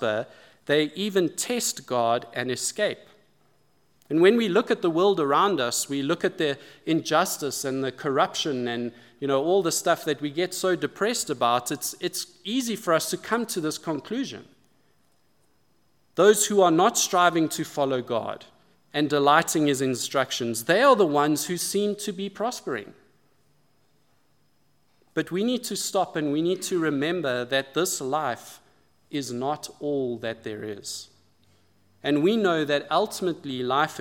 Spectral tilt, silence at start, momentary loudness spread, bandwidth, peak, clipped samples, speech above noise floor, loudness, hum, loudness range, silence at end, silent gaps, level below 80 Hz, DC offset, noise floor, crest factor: -3.5 dB/octave; 0 s; 13 LU; 17.5 kHz; -4 dBFS; under 0.1%; 43 dB; -25 LUFS; none; 9 LU; 0 s; none; -78 dBFS; under 0.1%; -68 dBFS; 22 dB